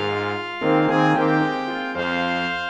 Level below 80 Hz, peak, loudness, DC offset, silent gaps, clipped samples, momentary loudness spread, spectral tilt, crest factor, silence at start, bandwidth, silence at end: -58 dBFS; -6 dBFS; -21 LUFS; under 0.1%; none; under 0.1%; 7 LU; -6.5 dB/octave; 16 dB; 0 s; 8.4 kHz; 0 s